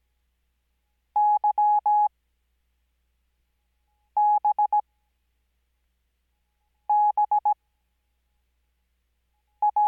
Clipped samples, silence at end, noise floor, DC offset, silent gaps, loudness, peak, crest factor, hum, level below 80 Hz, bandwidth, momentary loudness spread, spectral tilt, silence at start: under 0.1%; 0 s; -74 dBFS; under 0.1%; none; -23 LUFS; -16 dBFS; 10 dB; none; -74 dBFS; 2.6 kHz; 7 LU; -5 dB/octave; 1.15 s